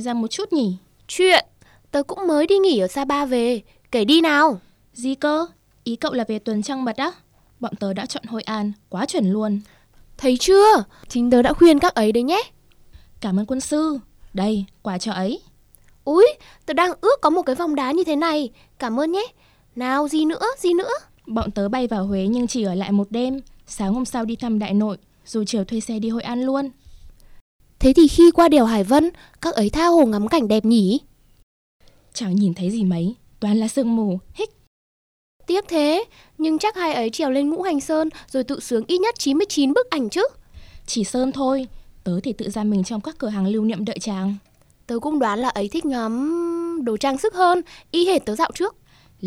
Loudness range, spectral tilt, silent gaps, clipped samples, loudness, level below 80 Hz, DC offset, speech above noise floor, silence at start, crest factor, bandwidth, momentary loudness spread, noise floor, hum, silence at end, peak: 8 LU; -5 dB/octave; 27.41-27.59 s, 31.43-31.80 s, 34.67-35.40 s; under 0.1%; -20 LUFS; -44 dBFS; under 0.1%; 33 dB; 0 s; 16 dB; 15 kHz; 13 LU; -52 dBFS; none; 0 s; -4 dBFS